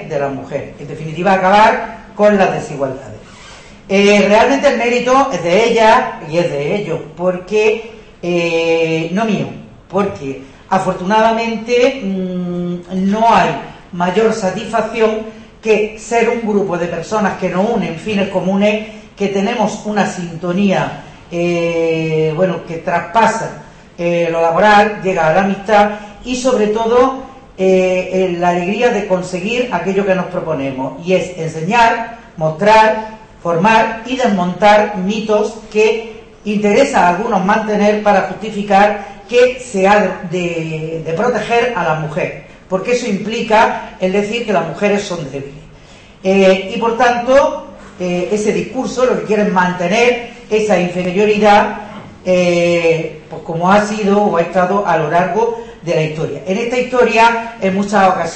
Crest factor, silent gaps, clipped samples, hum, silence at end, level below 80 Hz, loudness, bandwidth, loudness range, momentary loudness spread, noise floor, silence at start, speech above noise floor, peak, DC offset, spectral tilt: 14 dB; none; under 0.1%; none; 0 s; -44 dBFS; -14 LUFS; 8.8 kHz; 4 LU; 12 LU; -39 dBFS; 0 s; 26 dB; 0 dBFS; under 0.1%; -5.5 dB/octave